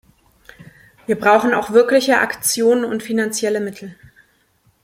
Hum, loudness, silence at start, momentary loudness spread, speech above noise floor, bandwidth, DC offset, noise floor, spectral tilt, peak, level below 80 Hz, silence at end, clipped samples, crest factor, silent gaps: none; -16 LUFS; 0.6 s; 14 LU; 43 dB; 16.5 kHz; under 0.1%; -59 dBFS; -3 dB/octave; -2 dBFS; -60 dBFS; 0.9 s; under 0.1%; 18 dB; none